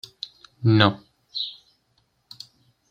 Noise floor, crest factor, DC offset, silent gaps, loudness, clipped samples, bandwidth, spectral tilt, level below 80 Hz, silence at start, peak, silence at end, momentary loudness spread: -68 dBFS; 24 dB; under 0.1%; none; -22 LUFS; under 0.1%; 7.4 kHz; -7 dB/octave; -64 dBFS; 0.6 s; -2 dBFS; 1.4 s; 25 LU